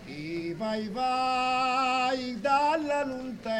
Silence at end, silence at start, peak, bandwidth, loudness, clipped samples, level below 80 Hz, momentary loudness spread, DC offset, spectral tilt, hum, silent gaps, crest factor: 0 s; 0 s; -14 dBFS; 12.5 kHz; -28 LUFS; under 0.1%; -60 dBFS; 9 LU; under 0.1%; -4.5 dB/octave; none; none; 14 dB